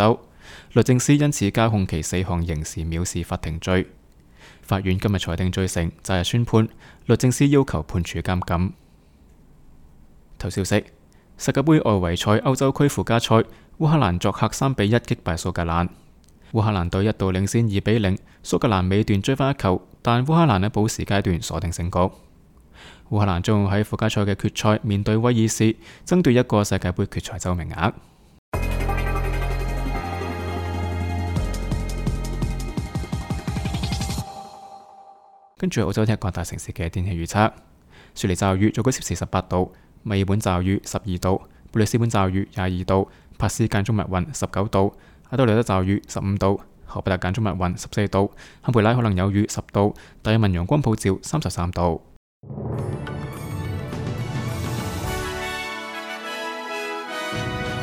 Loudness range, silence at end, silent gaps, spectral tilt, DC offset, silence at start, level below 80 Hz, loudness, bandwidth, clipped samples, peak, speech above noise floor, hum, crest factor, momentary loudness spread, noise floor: 7 LU; 0 s; 28.38-28.52 s, 52.16-52.41 s; -6 dB/octave; under 0.1%; 0 s; -36 dBFS; -23 LUFS; 17.5 kHz; under 0.1%; -4 dBFS; 31 dB; none; 18 dB; 10 LU; -52 dBFS